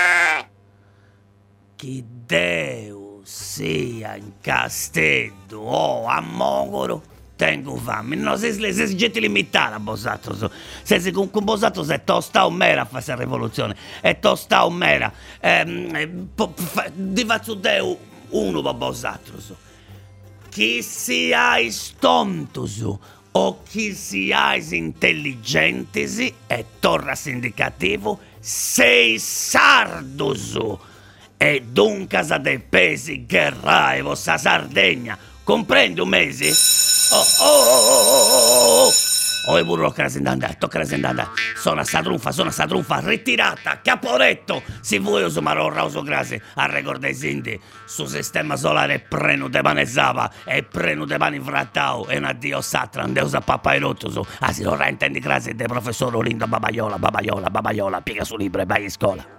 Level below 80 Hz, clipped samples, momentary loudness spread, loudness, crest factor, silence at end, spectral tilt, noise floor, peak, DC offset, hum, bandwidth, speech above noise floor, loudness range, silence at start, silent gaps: -50 dBFS; under 0.1%; 14 LU; -18 LUFS; 20 dB; 0.05 s; -2.5 dB/octave; -54 dBFS; 0 dBFS; under 0.1%; none; 16 kHz; 34 dB; 9 LU; 0 s; none